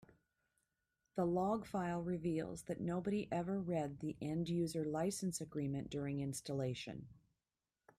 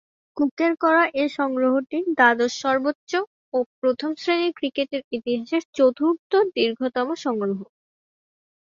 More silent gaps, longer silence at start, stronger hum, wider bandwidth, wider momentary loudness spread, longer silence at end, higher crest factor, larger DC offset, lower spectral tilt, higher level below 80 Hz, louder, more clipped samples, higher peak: second, none vs 0.51-0.57 s, 2.95-3.07 s, 3.27-3.52 s, 3.66-3.82 s, 5.04-5.11 s, 5.65-5.73 s, 6.19-6.30 s; first, 1.15 s vs 0.35 s; neither; first, 14.5 kHz vs 7.6 kHz; second, 6 LU vs 9 LU; second, 0.85 s vs 1 s; second, 14 dB vs 20 dB; neither; first, -6 dB/octave vs -4.5 dB/octave; about the same, -68 dBFS vs -70 dBFS; second, -41 LUFS vs -22 LUFS; neither; second, -26 dBFS vs -2 dBFS